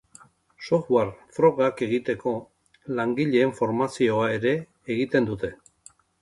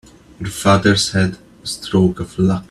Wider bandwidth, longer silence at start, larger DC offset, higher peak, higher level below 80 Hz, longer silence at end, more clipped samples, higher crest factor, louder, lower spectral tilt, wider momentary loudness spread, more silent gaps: second, 11.5 kHz vs 13 kHz; first, 0.6 s vs 0.4 s; neither; second, -6 dBFS vs 0 dBFS; second, -60 dBFS vs -44 dBFS; first, 0.65 s vs 0.05 s; neither; about the same, 20 dB vs 18 dB; second, -25 LUFS vs -17 LUFS; first, -6.5 dB/octave vs -5 dB/octave; second, 9 LU vs 15 LU; neither